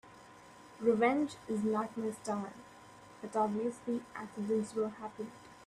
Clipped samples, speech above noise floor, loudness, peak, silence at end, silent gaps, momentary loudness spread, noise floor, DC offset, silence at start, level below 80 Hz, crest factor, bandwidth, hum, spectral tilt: under 0.1%; 21 dB; -35 LUFS; -18 dBFS; 0 s; none; 25 LU; -56 dBFS; under 0.1%; 0.05 s; -74 dBFS; 18 dB; 12.5 kHz; none; -6 dB/octave